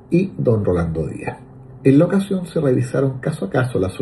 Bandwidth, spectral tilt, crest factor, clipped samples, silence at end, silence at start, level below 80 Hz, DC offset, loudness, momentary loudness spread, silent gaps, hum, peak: 12 kHz; -8.5 dB/octave; 18 dB; under 0.1%; 0 s; 0.1 s; -42 dBFS; under 0.1%; -19 LUFS; 11 LU; none; none; -2 dBFS